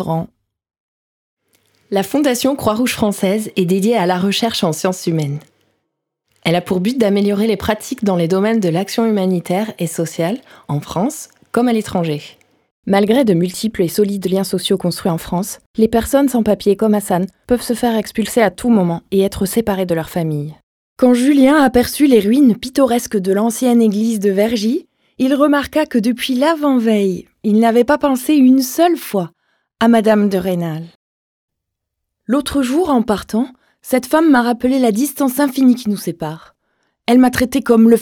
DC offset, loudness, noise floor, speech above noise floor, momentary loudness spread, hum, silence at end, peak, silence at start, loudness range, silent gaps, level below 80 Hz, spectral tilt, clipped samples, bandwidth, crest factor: under 0.1%; -15 LUFS; -77 dBFS; 63 dB; 10 LU; none; 0 s; 0 dBFS; 0 s; 5 LU; 0.80-1.37 s, 12.71-12.83 s, 15.66-15.74 s, 20.63-20.96 s, 30.95-31.48 s; -46 dBFS; -5.5 dB/octave; under 0.1%; 18.5 kHz; 16 dB